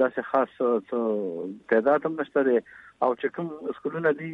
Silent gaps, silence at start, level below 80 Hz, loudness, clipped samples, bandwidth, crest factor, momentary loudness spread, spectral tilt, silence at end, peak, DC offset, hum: none; 0 s; -74 dBFS; -26 LUFS; under 0.1%; 4.3 kHz; 16 dB; 10 LU; -8.5 dB/octave; 0 s; -8 dBFS; under 0.1%; none